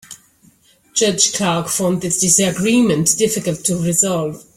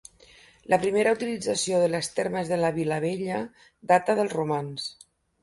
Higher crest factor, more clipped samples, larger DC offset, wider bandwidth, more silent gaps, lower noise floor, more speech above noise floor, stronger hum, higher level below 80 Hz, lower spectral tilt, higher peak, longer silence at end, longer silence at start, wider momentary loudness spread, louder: about the same, 16 dB vs 20 dB; neither; neither; first, 16.5 kHz vs 11.5 kHz; neither; about the same, -52 dBFS vs -55 dBFS; first, 36 dB vs 29 dB; neither; first, -52 dBFS vs -64 dBFS; about the same, -3.5 dB/octave vs -4.5 dB/octave; first, 0 dBFS vs -6 dBFS; second, 0.15 s vs 0.5 s; second, 0.1 s vs 0.7 s; second, 6 LU vs 11 LU; first, -15 LUFS vs -26 LUFS